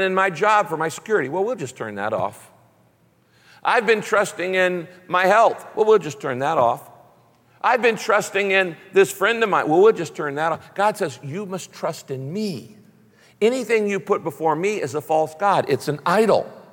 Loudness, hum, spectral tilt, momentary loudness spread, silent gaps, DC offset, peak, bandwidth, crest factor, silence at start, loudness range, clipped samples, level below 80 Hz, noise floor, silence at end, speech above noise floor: -20 LUFS; none; -4.5 dB/octave; 11 LU; none; under 0.1%; -4 dBFS; 17 kHz; 16 dB; 0 s; 6 LU; under 0.1%; -68 dBFS; -59 dBFS; 0.1 s; 39 dB